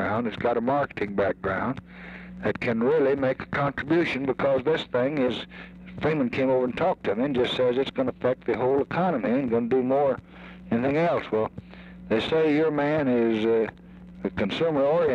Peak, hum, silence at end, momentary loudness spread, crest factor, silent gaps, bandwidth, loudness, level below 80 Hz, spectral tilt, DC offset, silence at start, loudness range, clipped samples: -12 dBFS; none; 0 s; 11 LU; 12 dB; none; 8 kHz; -25 LUFS; -54 dBFS; -7.5 dB/octave; under 0.1%; 0 s; 2 LU; under 0.1%